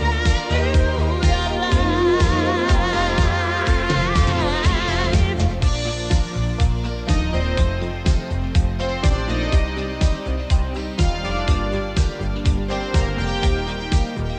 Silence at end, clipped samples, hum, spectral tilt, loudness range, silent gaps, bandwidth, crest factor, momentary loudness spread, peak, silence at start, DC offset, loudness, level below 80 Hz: 0 s; under 0.1%; none; -5.5 dB/octave; 3 LU; none; 9.2 kHz; 14 dB; 5 LU; -4 dBFS; 0 s; under 0.1%; -20 LUFS; -22 dBFS